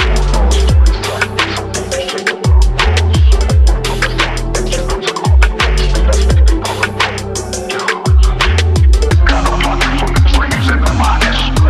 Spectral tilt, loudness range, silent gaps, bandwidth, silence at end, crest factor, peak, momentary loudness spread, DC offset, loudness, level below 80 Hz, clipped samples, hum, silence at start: -4.5 dB/octave; 2 LU; none; 13 kHz; 0 s; 10 dB; 0 dBFS; 6 LU; under 0.1%; -13 LUFS; -12 dBFS; under 0.1%; none; 0 s